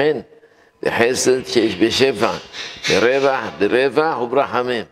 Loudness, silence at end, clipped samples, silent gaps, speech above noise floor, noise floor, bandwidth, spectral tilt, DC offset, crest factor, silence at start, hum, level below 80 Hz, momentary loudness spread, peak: -17 LUFS; 0.05 s; under 0.1%; none; 33 dB; -50 dBFS; 15 kHz; -3.5 dB/octave; under 0.1%; 18 dB; 0 s; none; -56 dBFS; 8 LU; 0 dBFS